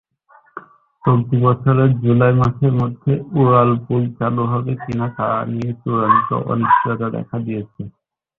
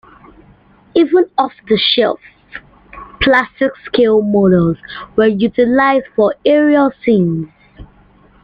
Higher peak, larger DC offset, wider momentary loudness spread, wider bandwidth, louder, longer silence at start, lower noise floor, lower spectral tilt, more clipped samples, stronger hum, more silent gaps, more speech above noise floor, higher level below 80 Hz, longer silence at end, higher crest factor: about the same, -2 dBFS vs -2 dBFS; neither; about the same, 12 LU vs 13 LU; second, 4 kHz vs 5.4 kHz; second, -17 LUFS vs -13 LUFS; second, 0.55 s vs 0.95 s; first, -52 dBFS vs -47 dBFS; first, -10.5 dB/octave vs -8.5 dB/octave; neither; neither; neither; about the same, 36 dB vs 34 dB; about the same, -48 dBFS vs -44 dBFS; about the same, 0.5 s vs 0.6 s; about the same, 16 dB vs 14 dB